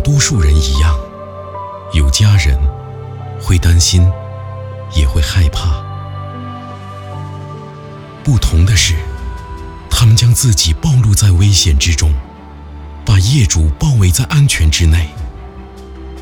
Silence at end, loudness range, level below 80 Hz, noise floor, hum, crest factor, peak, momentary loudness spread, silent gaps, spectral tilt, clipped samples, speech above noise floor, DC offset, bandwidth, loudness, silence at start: 0 s; 7 LU; -20 dBFS; -31 dBFS; none; 12 dB; 0 dBFS; 19 LU; none; -4 dB/octave; under 0.1%; 22 dB; under 0.1%; 18 kHz; -12 LUFS; 0 s